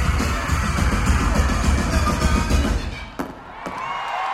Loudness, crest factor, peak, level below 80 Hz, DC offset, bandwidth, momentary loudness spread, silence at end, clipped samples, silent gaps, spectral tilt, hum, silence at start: -22 LUFS; 14 dB; -6 dBFS; -24 dBFS; under 0.1%; 14.5 kHz; 12 LU; 0 s; under 0.1%; none; -5 dB/octave; none; 0 s